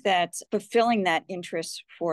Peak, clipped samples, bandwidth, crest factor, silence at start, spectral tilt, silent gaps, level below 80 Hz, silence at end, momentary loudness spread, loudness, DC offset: -10 dBFS; under 0.1%; 12.5 kHz; 16 dB; 0.05 s; -3.5 dB/octave; none; -76 dBFS; 0 s; 10 LU; -26 LUFS; under 0.1%